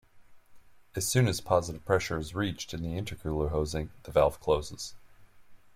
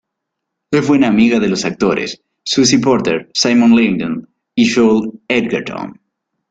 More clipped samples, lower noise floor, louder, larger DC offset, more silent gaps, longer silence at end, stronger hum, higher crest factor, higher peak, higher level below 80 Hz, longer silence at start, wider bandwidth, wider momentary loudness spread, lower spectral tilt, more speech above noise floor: neither; second, -53 dBFS vs -77 dBFS; second, -30 LUFS vs -14 LUFS; neither; neither; second, 0.05 s vs 0.55 s; neither; first, 22 dB vs 14 dB; second, -10 dBFS vs 0 dBFS; about the same, -48 dBFS vs -52 dBFS; second, 0.15 s vs 0.7 s; first, 16.5 kHz vs 9 kHz; about the same, 11 LU vs 13 LU; about the same, -5 dB/octave vs -4.5 dB/octave; second, 24 dB vs 64 dB